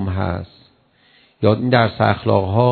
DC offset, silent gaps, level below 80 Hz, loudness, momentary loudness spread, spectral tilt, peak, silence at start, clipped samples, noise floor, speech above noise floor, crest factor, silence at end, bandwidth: under 0.1%; none; -46 dBFS; -18 LUFS; 11 LU; -10.5 dB/octave; 0 dBFS; 0 s; under 0.1%; -55 dBFS; 39 dB; 18 dB; 0 s; 4.5 kHz